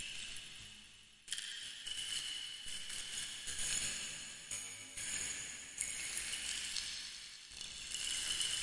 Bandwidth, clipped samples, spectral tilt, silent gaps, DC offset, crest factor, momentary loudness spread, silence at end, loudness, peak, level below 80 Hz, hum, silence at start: 11.5 kHz; under 0.1%; 1.5 dB/octave; none; under 0.1%; 26 dB; 11 LU; 0 s; -41 LUFS; -18 dBFS; -64 dBFS; none; 0 s